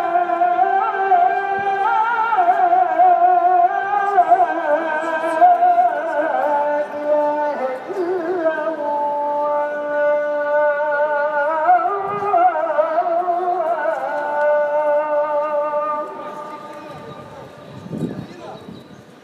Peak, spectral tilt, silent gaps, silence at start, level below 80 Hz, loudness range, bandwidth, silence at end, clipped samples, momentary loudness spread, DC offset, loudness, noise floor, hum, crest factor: -2 dBFS; -6 dB/octave; none; 0 s; -68 dBFS; 7 LU; 8.4 kHz; 0.2 s; under 0.1%; 17 LU; under 0.1%; -18 LUFS; -40 dBFS; none; 16 dB